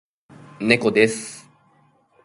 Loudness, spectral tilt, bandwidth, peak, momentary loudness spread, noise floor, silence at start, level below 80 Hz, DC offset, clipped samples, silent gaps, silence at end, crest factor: -19 LUFS; -4.5 dB/octave; 11.5 kHz; 0 dBFS; 19 LU; -59 dBFS; 0.6 s; -64 dBFS; under 0.1%; under 0.1%; none; 0.85 s; 24 dB